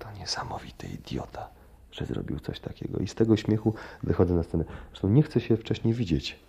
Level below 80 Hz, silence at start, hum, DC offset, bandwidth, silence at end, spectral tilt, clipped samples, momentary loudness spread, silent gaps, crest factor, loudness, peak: -48 dBFS; 0 s; none; under 0.1%; 14 kHz; 0.15 s; -7 dB/octave; under 0.1%; 15 LU; none; 20 dB; -28 LUFS; -8 dBFS